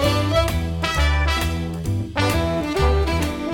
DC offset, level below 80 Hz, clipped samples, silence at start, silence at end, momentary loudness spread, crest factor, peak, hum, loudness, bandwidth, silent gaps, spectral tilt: under 0.1%; -26 dBFS; under 0.1%; 0 s; 0 s; 5 LU; 16 dB; -4 dBFS; none; -21 LUFS; 17.5 kHz; none; -5.5 dB/octave